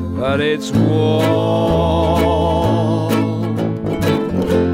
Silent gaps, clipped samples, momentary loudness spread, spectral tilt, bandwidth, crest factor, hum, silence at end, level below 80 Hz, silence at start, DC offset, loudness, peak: none; under 0.1%; 4 LU; -7 dB/octave; 16 kHz; 12 dB; none; 0 s; -32 dBFS; 0 s; under 0.1%; -16 LUFS; -2 dBFS